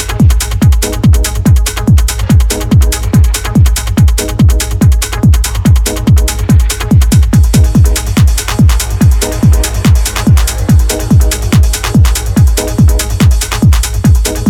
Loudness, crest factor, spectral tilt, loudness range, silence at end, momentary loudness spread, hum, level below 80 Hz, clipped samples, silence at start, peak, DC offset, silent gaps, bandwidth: -9 LUFS; 8 dB; -5.5 dB/octave; 1 LU; 0 s; 2 LU; none; -10 dBFS; under 0.1%; 0 s; 0 dBFS; under 0.1%; none; 17.5 kHz